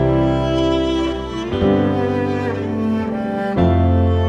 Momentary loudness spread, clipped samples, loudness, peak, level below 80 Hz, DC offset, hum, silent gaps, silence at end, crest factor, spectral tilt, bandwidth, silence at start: 6 LU; under 0.1%; -18 LUFS; -4 dBFS; -32 dBFS; under 0.1%; none; none; 0 s; 14 dB; -8 dB/octave; 8 kHz; 0 s